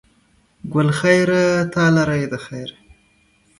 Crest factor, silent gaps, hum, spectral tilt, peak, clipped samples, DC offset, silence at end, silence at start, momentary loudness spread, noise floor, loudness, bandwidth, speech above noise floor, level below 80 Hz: 18 dB; none; none; -6 dB/octave; 0 dBFS; under 0.1%; under 0.1%; 0.9 s; 0.65 s; 17 LU; -58 dBFS; -17 LUFS; 11.5 kHz; 41 dB; -52 dBFS